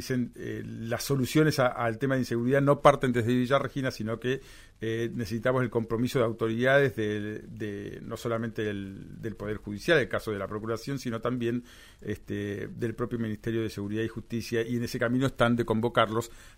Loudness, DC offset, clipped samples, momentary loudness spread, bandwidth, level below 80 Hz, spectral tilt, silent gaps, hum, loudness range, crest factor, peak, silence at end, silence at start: -29 LUFS; under 0.1%; under 0.1%; 13 LU; 16 kHz; -52 dBFS; -6 dB/octave; none; none; 7 LU; 22 dB; -6 dBFS; 0.1 s; 0 s